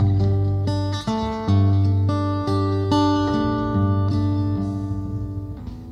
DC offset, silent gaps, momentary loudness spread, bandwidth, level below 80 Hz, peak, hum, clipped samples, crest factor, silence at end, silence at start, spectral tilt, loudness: under 0.1%; none; 9 LU; 7 kHz; -40 dBFS; -8 dBFS; none; under 0.1%; 12 dB; 0 s; 0 s; -8 dB/octave; -22 LUFS